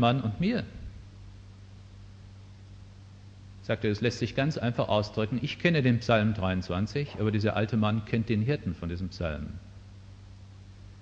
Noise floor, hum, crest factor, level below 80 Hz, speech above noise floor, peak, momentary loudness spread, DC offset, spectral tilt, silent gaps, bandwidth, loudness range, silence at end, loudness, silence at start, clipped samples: -49 dBFS; none; 20 dB; -50 dBFS; 21 dB; -10 dBFS; 24 LU; under 0.1%; -7 dB/octave; none; 7.8 kHz; 10 LU; 0 s; -29 LUFS; 0 s; under 0.1%